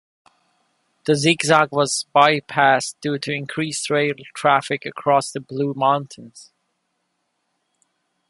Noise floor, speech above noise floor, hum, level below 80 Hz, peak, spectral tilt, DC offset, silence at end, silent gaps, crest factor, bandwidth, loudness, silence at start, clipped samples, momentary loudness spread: -73 dBFS; 53 dB; none; -66 dBFS; 0 dBFS; -4 dB/octave; under 0.1%; 1.85 s; none; 22 dB; 11.5 kHz; -19 LUFS; 1.05 s; under 0.1%; 10 LU